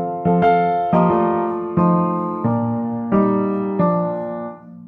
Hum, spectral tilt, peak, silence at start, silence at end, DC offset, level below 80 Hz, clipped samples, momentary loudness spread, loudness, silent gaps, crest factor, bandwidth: none; -11 dB/octave; -4 dBFS; 0 s; 0 s; under 0.1%; -54 dBFS; under 0.1%; 8 LU; -18 LUFS; none; 14 dB; 4.5 kHz